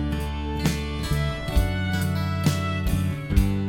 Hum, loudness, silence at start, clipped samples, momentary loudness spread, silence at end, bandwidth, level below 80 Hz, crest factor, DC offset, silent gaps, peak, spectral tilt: none; -25 LUFS; 0 s; under 0.1%; 4 LU; 0 s; 17 kHz; -28 dBFS; 18 dB; under 0.1%; none; -6 dBFS; -6 dB/octave